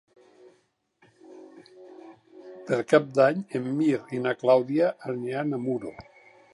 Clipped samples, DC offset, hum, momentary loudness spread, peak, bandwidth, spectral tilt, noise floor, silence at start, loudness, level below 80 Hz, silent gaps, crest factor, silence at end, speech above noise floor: under 0.1%; under 0.1%; none; 20 LU; -4 dBFS; 11.5 kHz; -7 dB/octave; -68 dBFS; 1.3 s; -25 LUFS; -72 dBFS; none; 22 dB; 0.55 s; 43 dB